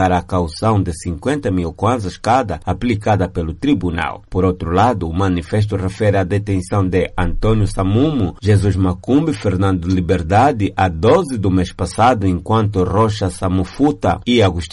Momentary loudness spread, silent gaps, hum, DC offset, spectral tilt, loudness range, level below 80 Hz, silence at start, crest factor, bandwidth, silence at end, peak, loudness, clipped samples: 6 LU; none; none; under 0.1%; -7 dB/octave; 3 LU; -32 dBFS; 0 s; 12 dB; 11.5 kHz; 0 s; -2 dBFS; -17 LUFS; under 0.1%